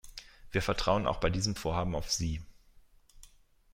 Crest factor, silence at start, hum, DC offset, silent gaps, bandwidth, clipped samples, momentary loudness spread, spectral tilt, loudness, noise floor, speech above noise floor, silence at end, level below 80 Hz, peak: 22 dB; 0.05 s; none; under 0.1%; none; 16.5 kHz; under 0.1%; 11 LU; -4.5 dB/octave; -32 LUFS; -60 dBFS; 29 dB; 0.45 s; -44 dBFS; -12 dBFS